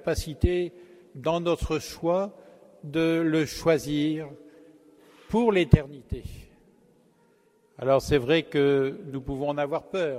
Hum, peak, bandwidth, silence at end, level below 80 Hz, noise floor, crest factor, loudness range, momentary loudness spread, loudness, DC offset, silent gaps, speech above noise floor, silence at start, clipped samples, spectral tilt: none; 0 dBFS; 16 kHz; 0 s; -42 dBFS; -63 dBFS; 26 dB; 2 LU; 13 LU; -26 LUFS; under 0.1%; none; 38 dB; 0.05 s; under 0.1%; -6.5 dB/octave